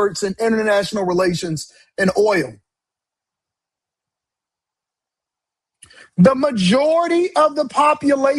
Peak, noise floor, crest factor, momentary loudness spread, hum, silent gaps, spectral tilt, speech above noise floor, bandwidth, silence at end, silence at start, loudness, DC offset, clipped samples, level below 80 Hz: 0 dBFS; -86 dBFS; 18 dB; 10 LU; none; none; -5.5 dB/octave; 70 dB; 12.5 kHz; 0 s; 0 s; -17 LUFS; under 0.1%; under 0.1%; -56 dBFS